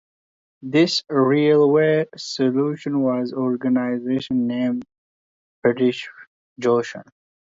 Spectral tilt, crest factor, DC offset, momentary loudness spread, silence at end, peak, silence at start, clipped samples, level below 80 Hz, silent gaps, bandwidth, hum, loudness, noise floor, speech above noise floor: -6 dB/octave; 16 dB; under 0.1%; 12 LU; 0.55 s; -4 dBFS; 0.65 s; under 0.1%; -66 dBFS; 4.98-5.62 s, 6.27-6.56 s; 7.8 kHz; none; -20 LUFS; under -90 dBFS; over 70 dB